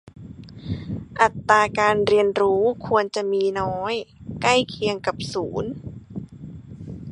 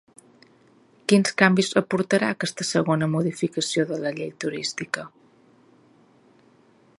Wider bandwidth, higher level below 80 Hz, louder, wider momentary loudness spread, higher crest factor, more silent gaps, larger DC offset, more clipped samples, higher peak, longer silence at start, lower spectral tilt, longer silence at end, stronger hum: about the same, 11 kHz vs 11.5 kHz; first, -48 dBFS vs -68 dBFS; about the same, -22 LUFS vs -23 LUFS; first, 21 LU vs 11 LU; about the same, 22 dB vs 24 dB; neither; neither; neither; about the same, -2 dBFS vs 0 dBFS; second, 0.05 s vs 1.1 s; about the same, -5 dB/octave vs -4.5 dB/octave; second, 0 s vs 1.9 s; neither